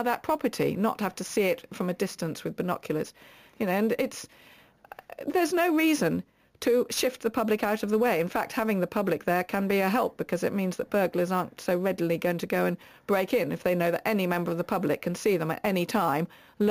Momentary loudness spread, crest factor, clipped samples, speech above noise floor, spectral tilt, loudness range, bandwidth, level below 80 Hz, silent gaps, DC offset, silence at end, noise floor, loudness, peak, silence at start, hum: 7 LU; 14 dB; under 0.1%; 23 dB; -5.5 dB/octave; 4 LU; 15.5 kHz; -64 dBFS; none; under 0.1%; 0 s; -50 dBFS; -28 LUFS; -14 dBFS; 0 s; none